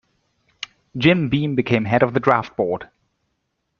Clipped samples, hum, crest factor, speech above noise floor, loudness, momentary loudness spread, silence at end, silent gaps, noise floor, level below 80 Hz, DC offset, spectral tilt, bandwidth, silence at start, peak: under 0.1%; none; 20 dB; 55 dB; -19 LUFS; 17 LU; 0.95 s; none; -73 dBFS; -54 dBFS; under 0.1%; -7.5 dB/octave; 7.2 kHz; 0.6 s; 0 dBFS